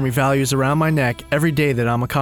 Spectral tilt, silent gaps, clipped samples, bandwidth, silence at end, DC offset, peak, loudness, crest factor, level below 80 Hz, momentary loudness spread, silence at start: -6 dB/octave; none; under 0.1%; 19 kHz; 0 s; under 0.1%; -6 dBFS; -18 LUFS; 12 dB; -42 dBFS; 3 LU; 0 s